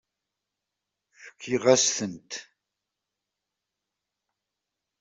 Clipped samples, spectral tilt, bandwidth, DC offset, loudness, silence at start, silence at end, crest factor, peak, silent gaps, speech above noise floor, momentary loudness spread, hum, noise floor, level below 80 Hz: under 0.1%; -2.5 dB/octave; 8.2 kHz; under 0.1%; -24 LUFS; 1.2 s; 2.6 s; 26 dB; -4 dBFS; none; 61 dB; 19 LU; none; -86 dBFS; -72 dBFS